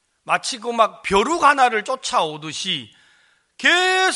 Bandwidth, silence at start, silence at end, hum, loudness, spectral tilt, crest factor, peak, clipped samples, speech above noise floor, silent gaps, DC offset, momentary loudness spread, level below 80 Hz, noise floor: 11.5 kHz; 0.25 s; 0 s; none; -19 LUFS; -2 dB/octave; 20 dB; 0 dBFS; under 0.1%; 40 dB; none; under 0.1%; 10 LU; -52 dBFS; -58 dBFS